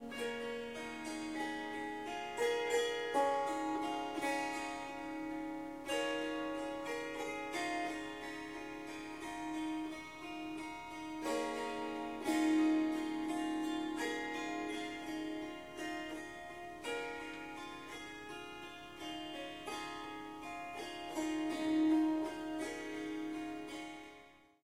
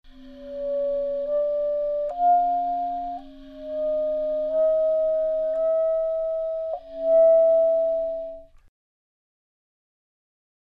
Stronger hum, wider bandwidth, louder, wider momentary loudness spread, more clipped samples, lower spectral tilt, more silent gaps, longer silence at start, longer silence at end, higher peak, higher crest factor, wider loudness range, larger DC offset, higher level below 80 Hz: neither; first, 15.5 kHz vs 4.5 kHz; second, -40 LUFS vs -23 LUFS; about the same, 12 LU vs 14 LU; neither; second, -3.5 dB/octave vs -7 dB/octave; neither; about the same, 0 s vs 0.05 s; second, 0 s vs 2.25 s; second, -22 dBFS vs -12 dBFS; first, 18 dB vs 12 dB; first, 8 LU vs 4 LU; neither; second, -70 dBFS vs -54 dBFS